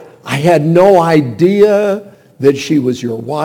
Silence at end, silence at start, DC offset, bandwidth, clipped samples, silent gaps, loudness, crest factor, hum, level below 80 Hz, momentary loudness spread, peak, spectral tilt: 0 s; 0 s; under 0.1%; 17.5 kHz; 0.6%; none; -11 LUFS; 12 dB; none; -52 dBFS; 11 LU; 0 dBFS; -7 dB/octave